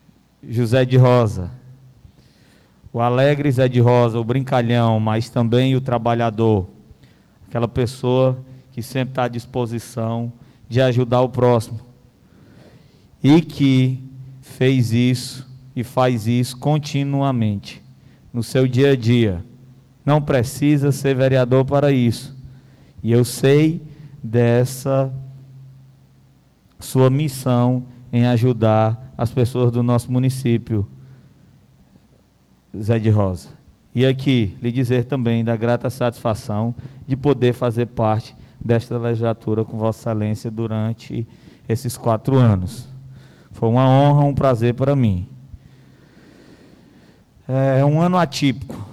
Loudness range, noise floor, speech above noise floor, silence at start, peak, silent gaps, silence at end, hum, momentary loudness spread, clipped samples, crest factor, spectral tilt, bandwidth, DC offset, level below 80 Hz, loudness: 5 LU; -55 dBFS; 38 dB; 0.45 s; -6 dBFS; none; 0 s; none; 14 LU; under 0.1%; 14 dB; -7.5 dB/octave; 13.5 kHz; under 0.1%; -50 dBFS; -18 LUFS